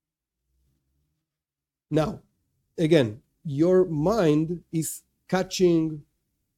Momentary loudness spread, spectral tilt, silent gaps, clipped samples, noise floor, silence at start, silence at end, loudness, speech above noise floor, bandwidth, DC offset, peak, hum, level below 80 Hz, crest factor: 18 LU; -6 dB/octave; none; under 0.1%; under -90 dBFS; 1.9 s; 0.55 s; -24 LUFS; over 67 dB; 16 kHz; under 0.1%; -4 dBFS; none; -56 dBFS; 22 dB